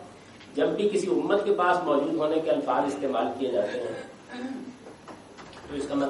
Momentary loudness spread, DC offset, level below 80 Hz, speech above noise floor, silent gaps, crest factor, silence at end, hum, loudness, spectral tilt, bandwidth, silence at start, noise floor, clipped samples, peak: 22 LU; under 0.1%; -64 dBFS; 21 dB; none; 16 dB; 0 s; none; -27 LUFS; -5.5 dB/octave; 11.5 kHz; 0 s; -47 dBFS; under 0.1%; -10 dBFS